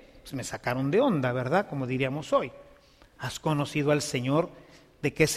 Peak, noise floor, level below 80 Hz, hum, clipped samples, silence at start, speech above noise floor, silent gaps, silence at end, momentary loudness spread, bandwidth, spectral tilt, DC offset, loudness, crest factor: -8 dBFS; -57 dBFS; -58 dBFS; none; under 0.1%; 0.15 s; 29 dB; none; 0 s; 12 LU; 15.5 kHz; -5.5 dB/octave; under 0.1%; -28 LUFS; 20 dB